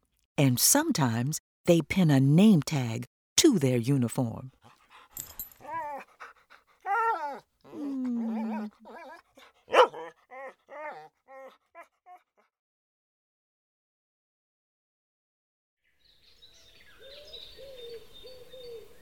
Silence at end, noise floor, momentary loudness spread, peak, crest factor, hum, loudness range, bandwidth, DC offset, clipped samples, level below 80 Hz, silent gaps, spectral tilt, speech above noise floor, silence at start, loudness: 0.15 s; -66 dBFS; 25 LU; -6 dBFS; 24 dB; none; 24 LU; over 20 kHz; under 0.1%; under 0.1%; -64 dBFS; 1.40-1.64 s, 3.07-3.36 s, 12.59-15.77 s; -4.5 dB/octave; 42 dB; 0.4 s; -26 LUFS